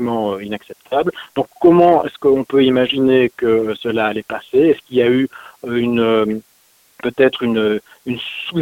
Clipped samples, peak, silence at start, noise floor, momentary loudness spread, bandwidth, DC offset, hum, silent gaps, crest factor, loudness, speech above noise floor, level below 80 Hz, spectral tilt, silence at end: under 0.1%; 0 dBFS; 0 s; -50 dBFS; 12 LU; 16.5 kHz; under 0.1%; none; none; 16 dB; -16 LUFS; 34 dB; -54 dBFS; -7 dB/octave; 0 s